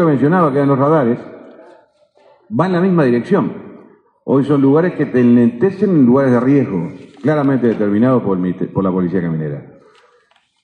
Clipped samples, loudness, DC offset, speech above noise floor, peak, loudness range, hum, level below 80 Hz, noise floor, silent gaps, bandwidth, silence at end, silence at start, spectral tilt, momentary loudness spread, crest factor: under 0.1%; -14 LUFS; under 0.1%; 43 dB; -2 dBFS; 4 LU; none; -58 dBFS; -56 dBFS; none; 6.2 kHz; 1 s; 0 s; -10 dB/octave; 12 LU; 14 dB